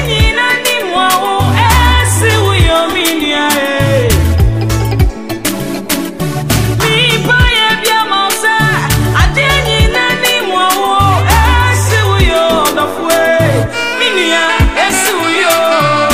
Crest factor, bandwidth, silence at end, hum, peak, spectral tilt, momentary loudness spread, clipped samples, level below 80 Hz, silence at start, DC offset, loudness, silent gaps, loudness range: 10 dB; 16 kHz; 0 s; none; 0 dBFS; -4 dB/octave; 5 LU; under 0.1%; -20 dBFS; 0 s; 2%; -10 LUFS; none; 3 LU